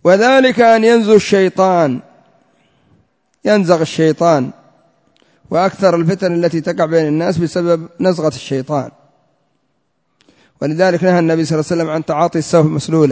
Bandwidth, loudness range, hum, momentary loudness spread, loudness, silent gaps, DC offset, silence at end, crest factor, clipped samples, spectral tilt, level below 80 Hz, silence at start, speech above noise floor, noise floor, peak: 8 kHz; 5 LU; none; 10 LU; -13 LUFS; none; under 0.1%; 0 s; 14 dB; under 0.1%; -6 dB/octave; -54 dBFS; 0.05 s; 53 dB; -66 dBFS; 0 dBFS